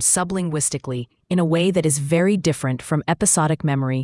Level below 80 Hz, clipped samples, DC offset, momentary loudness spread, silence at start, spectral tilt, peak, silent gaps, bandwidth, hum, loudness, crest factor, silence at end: -52 dBFS; under 0.1%; under 0.1%; 7 LU; 0 s; -4.5 dB/octave; -4 dBFS; none; 12 kHz; none; -20 LUFS; 16 dB; 0 s